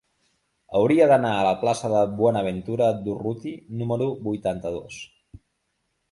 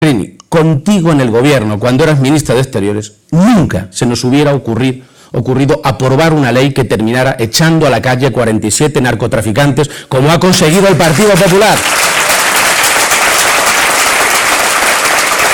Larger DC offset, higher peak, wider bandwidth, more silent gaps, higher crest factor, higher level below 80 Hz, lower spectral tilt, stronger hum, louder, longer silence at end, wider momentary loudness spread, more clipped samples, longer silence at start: neither; second, -6 dBFS vs 0 dBFS; second, 11.5 kHz vs over 20 kHz; neither; first, 18 dB vs 10 dB; second, -56 dBFS vs -36 dBFS; first, -6.5 dB/octave vs -4 dB/octave; neither; second, -23 LUFS vs -9 LUFS; first, 1.05 s vs 0 s; first, 16 LU vs 7 LU; neither; first, 0.7 s vs 0 s